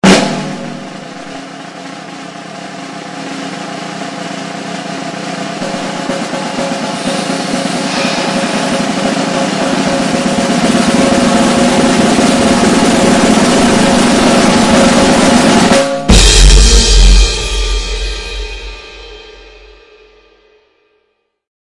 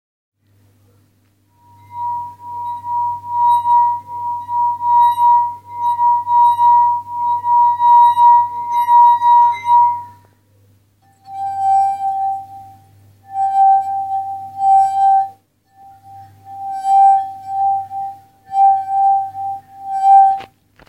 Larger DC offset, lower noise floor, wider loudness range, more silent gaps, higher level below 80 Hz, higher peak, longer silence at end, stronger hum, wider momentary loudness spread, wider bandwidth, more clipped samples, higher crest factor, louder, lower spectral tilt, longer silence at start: neither; first, -62 dBFS vs -57 dBFS; first, 16 LU vs 8 LU; neither; first, -18 dBFS vs -66 dBFS; about the same, 0 dBFS vs -2 dBFS; first, 2.15 s vs 0.45 s; neither; about the same, 19 LU vs 17 LU; about the same, 12 kHz vs 12 kHz; first, 0.4% vs under 0.1%; about the same, 12 dB vs 14 dB; first, -11 LUFS vs -14 LUFS; about the same, -4 dB/octave vs -3.5 dB/octave; second, 0.05 s vs 1.9 s